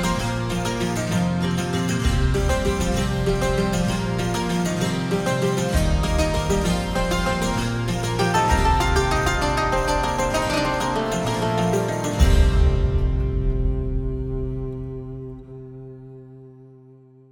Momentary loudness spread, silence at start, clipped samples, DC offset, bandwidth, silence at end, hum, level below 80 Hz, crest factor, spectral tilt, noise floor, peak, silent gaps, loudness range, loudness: 11 LU; 0 s; under 0.1%; under 0.1%; 17 kHz; 0.65 s; none; -26 dBFS; 18 dB; -5.5 dB/octave; -48 dBFS; -4 dBFS; none; 6 LU; -22 LUFS